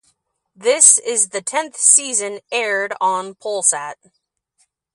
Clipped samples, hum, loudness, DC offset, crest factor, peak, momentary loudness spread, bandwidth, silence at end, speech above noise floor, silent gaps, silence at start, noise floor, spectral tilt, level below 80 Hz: under 0.1%; none; -15 LUFS; under 0.1%; 20 dB; 0 dBFS; 14 LU; 15 kHz; 1 s; 47 dB; none; 0.6 s; -65 dBFS; 0.5 dB/octave; -76 dBFS